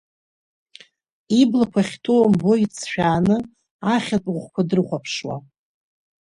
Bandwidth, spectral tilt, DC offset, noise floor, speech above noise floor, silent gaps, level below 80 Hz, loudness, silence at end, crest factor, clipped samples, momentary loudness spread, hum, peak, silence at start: 11 kHz; -6 dB/octave; under 0.1%; -50 dBFS; 30 dB; 3.71-3.79 s; -54 dBFS; -20 LUFS; 0.8 s; 16 dB; under 0.1%; 11 LU; none; -4 dBFS; 1.3 s